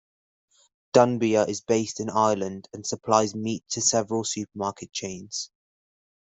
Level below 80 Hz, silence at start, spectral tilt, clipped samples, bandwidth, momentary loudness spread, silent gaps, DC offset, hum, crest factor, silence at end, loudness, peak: -68 dBFS; 0.95 s; -4 dB/octave; under 0.1%; 8.4 kHz; 12 LU; none; under 0.1%; none; 22 dB; 0.8 s; -25 LUFS; -4 dBFS